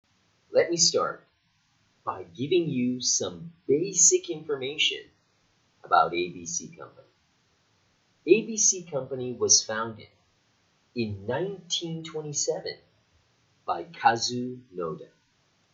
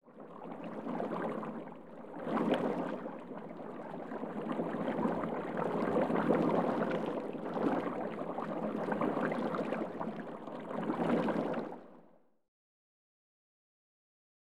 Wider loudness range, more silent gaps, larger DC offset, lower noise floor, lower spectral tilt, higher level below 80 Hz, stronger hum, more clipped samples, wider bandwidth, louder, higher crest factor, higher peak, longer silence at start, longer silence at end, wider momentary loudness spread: about the same, 7 LU vs 5 LU; neither; second, under 0.1% vs 0.1%; first, -69 dBFS vs -64 dBFS; second, -2 dB/octave vs -8 dB/octave; about the same, -72 dBFS vs -72 dBFS; neither; neither; second, 8.2 kHz vs 12 kHz; first, -26 LUFS vs -36 LUFS; about the same, 24 dB vs 20 dB; first, -6 dBFS vs -16 dBFS; first, 0.5 s vs 0 s; second, 0.7 s vs 2 s; first, 17 LU vs 13 LU